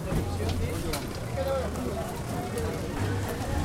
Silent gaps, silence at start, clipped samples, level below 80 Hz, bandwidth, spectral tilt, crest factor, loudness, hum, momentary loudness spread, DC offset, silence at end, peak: none; 0 s; under 0.1%; -38 dBFS; 16.5 kHz; -5.5 dB/octave; 14 dB; -31 LUFS; none; 3 LU; under 0.1%; 0 s; -16 dBFS